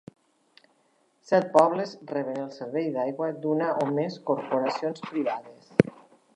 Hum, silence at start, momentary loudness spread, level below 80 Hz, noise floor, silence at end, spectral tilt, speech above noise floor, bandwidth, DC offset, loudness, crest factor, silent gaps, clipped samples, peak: none; 1.3 s; 11 LU; -64 dBFS; -67 dBFS; 0.45 s; -7 dB/octave; 41 dB; 10.5 kHz; under 0.1%; -27 LUFS; 28 dB; none; under 0.1%; 0 dBFS